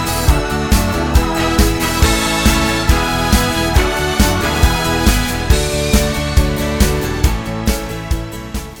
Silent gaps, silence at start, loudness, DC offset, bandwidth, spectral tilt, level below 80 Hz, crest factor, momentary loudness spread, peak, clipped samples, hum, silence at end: none; 0 s; -15 LUFS; 0.3%; 18 kHz; -4.5 dB/octave; -18 dBFS; 14 dB; 6 LU; 0 dBFS; under 0.1%; none; 0 s